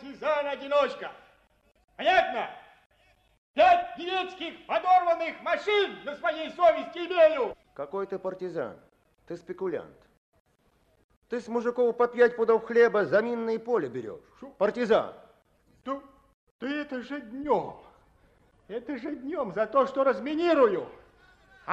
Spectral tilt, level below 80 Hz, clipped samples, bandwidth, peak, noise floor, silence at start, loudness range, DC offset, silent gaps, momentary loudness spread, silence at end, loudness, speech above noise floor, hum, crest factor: -5.5 dB/octave; -66 dBFS; under 0.1%; 8.2 kHz; -10 dBFS; -67 dBFS; 0 s; 9 LU; under 0.1%; 1.84-1.88 s, 2.86-2.90 s, 3.38-3.54 s, 10.17-10.32 s, 10.40-10.45 s, 11.04-11.09 s, 11.16-11.22 s, 16.34-16.59 s; 16 LU; 0 s; -27 LUFS; 41 dB; none; 18 dB